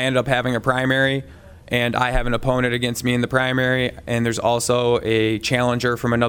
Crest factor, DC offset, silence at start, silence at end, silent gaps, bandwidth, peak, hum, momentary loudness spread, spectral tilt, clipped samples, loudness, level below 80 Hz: 16 dB; under 0.1%; 0 s; 0 s; none; 18 kHz; -4 dBFS; none; 3 LU; -5 dB/octave; under 0.1%; -20 LUFS; -36 dBFS